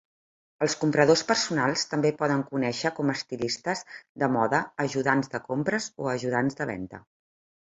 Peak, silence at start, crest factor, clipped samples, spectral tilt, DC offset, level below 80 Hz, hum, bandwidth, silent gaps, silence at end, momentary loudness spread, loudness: -4 dBFS; 0.6 s; 22 dB; under 0.1%; -4.5 dB/octave; under 0.1%; -64 dBFS; none; 8.2 kHz; 4.09-4.15 s; 0.75 s; 9 LU; -26 LUFS